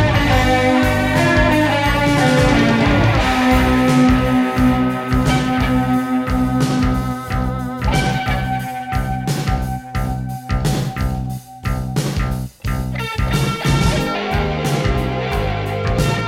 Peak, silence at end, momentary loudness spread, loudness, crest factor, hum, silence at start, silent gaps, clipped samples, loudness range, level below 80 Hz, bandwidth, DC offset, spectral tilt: -2 dBFS; 0 s; 9 LU; -17 LUFS; 14 dB; none; 0 s; none; under 0.1%; 8 LU; -26 dBFS; 16.5 kHz; under 0.1%; -6 dB/octave